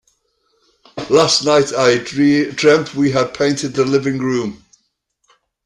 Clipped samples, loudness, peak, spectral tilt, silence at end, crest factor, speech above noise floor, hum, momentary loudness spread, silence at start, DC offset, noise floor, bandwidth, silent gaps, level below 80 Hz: under 0.1%; -15 LUFS; 0 dBFS; -4.5 dB/octave; 1.1 s; 16 dB; 52 dB; none; 8 LU; 0.95 s; under 0.1%; -67 dBFS; 11.5 kHz; none; -54 dBFS